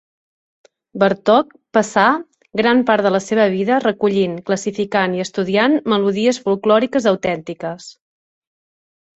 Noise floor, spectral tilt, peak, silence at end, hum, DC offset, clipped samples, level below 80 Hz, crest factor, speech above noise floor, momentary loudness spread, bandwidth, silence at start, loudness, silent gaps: under -90 dBFS; -5 dB/octave; -2 dBFS; 1.25 s; none; under 0.1%; under 0.1%; -58 dBFS; 16 dB; over 74 dB; 9 LU; 8.2 kHz; 0.95 s; -17 LUFS; none